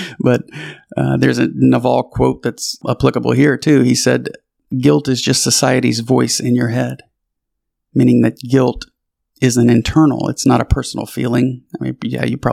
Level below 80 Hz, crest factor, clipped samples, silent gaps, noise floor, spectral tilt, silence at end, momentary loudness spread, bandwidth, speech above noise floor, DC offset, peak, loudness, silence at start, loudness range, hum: -34 dBFS; 14 dB; under 0.1%; none; -76 dBFS; -5 dB/octave; 0 s; 11 LU; 15.5 kHz; 62 dB; under 0.1%; 0 dBFS; -15 LUFS; 0 s; 2 LU; none